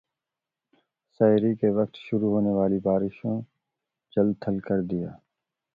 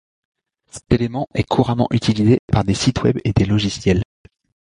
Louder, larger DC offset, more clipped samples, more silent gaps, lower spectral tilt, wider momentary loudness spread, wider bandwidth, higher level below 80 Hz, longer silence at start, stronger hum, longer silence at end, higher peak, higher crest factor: second, -25 LUFS vs -18 LUFS; neither; neither; second, none vs 2.39-2.48 s; first, -11 dB/octave vs -6.5 dB/octave; first, 10 LU vs 6 LU; second, 4.9 kHz vs 11 kHz; second, -60 dBFS vs -36 dBFS; first, 1.2 s vs 0.75 s; neither; about the same, 0.6 s vs 0.65 s; second, -8 dBFS vs -2 dBFS; about the same, 18 dB vs 16 dB